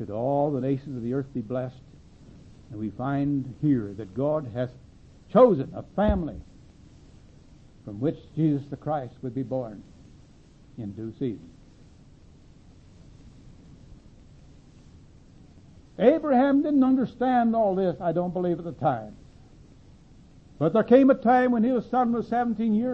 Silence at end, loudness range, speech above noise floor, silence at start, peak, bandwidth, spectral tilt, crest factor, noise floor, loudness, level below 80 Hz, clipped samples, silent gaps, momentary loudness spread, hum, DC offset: 0 s; 14 LU; 28 dB; 0 s; -6 dBFS; 6.6 kHz; -9.5 dB/octave; 20 dB; -53 dBFS; -25 LUFS; -48 dBFS; under 0.1%; none; 17 LU; none; under 0.1%